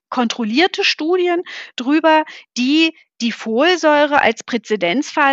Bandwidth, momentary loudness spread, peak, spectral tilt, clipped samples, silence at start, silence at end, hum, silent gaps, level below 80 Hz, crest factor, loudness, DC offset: 8 kHz; 10 LU; 0 dBFS; -3.5 dB/octave; under 0.1%; 0.1 s; 0 s; none; none; -62 dBFS; 16 dB; -16 LUFS; under 0.1%